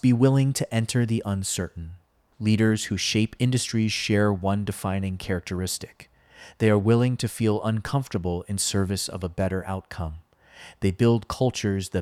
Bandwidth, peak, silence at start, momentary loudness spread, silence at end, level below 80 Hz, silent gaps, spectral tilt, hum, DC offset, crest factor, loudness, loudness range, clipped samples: 15 kHz; -8 dBFS; 0.05 s; 9 LU; 0 s; -50 dBFS; none; -5.5 dB/octave; none; under 0.1%; 18 dB; -25 LUFS; 3 LU; under 0.1%